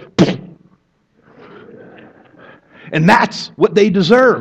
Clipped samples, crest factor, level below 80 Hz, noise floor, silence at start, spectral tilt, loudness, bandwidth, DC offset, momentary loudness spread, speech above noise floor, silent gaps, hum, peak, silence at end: under 0.1%; 16 dB; -52 dBFS; -58 dBFS; 0.2 s; -6 dB/octave; -13 LUFS; 12 kHz; under 0.1%; 9 LU; 46 dB; none; none; 0 dBFS; 0 s